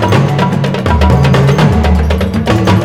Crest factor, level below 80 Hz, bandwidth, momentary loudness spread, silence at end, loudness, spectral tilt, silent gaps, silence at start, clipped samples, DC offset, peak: 8 dB; -16 dBFS; 15 kHz; 4 LU; 0 s; -10 LUFS; -7 dB/octave; none; 0 s; 0.3%; 0.8%; 0 dBFS